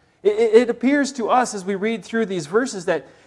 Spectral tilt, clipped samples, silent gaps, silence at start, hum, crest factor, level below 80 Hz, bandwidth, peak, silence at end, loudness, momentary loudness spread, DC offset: -4.5 dB/octave; under 0.1%; none; 0.25 s; none; 18 dB; -66 dBFS; 12 kHz; 0 dBFS; 0.2 s; -20 LUFS; 8 LU; under 0.1%